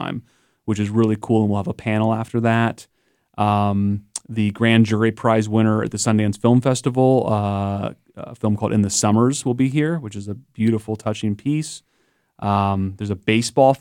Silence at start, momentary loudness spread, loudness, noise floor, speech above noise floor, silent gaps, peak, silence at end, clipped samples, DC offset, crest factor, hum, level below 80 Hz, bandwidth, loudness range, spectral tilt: 0 s; 12 LU; -20 LUFS; -65 dBFS; 46 dB; none; 0 dBFS; 0.05 s; under 0.1%; under 0.1%; 18 dB; none; -58 dBFS; 13.5 kHz; 5 LU; -6 dB/octave